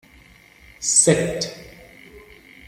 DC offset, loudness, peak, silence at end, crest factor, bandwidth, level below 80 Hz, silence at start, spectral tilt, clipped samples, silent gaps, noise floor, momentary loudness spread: under 0.1%; -18 LUFS; -2 dBFS; 0.5 s; 22 dB; 16 kHz; -52 dBFS; 0.8 s; -3 dB/octave; under 0.1%; none; -50 dBFS; 15 LU